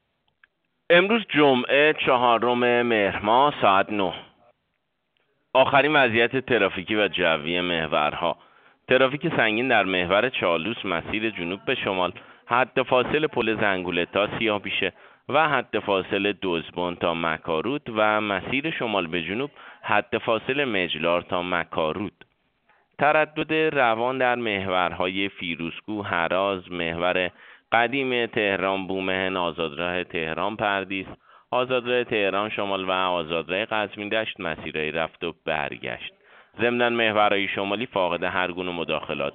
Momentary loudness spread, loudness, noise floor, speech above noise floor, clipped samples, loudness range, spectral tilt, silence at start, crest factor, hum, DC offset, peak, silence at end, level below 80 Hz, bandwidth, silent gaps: 9 LU; -23 LUFS; -76 dBFS; 52 dB; under 0.1%; 4 LU; -2 dB/octave; 0.9 s; 22 dB; none; under 0.1%; -2 dBFS; 0 s; -58 dBFS; 4.7 kHz; none